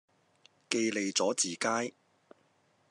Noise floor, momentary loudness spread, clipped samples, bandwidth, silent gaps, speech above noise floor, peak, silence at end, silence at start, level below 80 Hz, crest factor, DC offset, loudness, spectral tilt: -70 dBFS; 5 LU; under 0.1%; 12 kHz; none; 39 dB; -8 dBFS; 1 s; 0.7 s; -90 dBFS; 26 dB; under 0.1%; -31 LUFS; -2 dB/octave